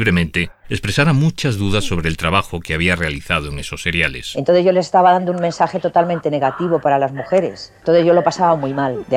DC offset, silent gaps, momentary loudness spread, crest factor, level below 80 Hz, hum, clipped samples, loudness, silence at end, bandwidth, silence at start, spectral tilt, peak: under 0.1%; none; 8 LU; 14 dB; -36 dBFS; none; under 0.1%; -17 LUFS; 0 s; 15 kHz; 0 s; -6 dB/octave; -2 dBFS